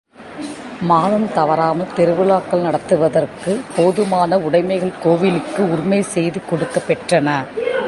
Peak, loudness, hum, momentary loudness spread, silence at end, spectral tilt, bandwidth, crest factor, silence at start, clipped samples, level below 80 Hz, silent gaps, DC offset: -2 dBFS; -17 LUFS; none; 6 LU; 0 s; -6.5 dB/octave; 11.5 kHz; 16 dB; 0.2 s; under 0.1%; -54 dBFS; none; under 0.1%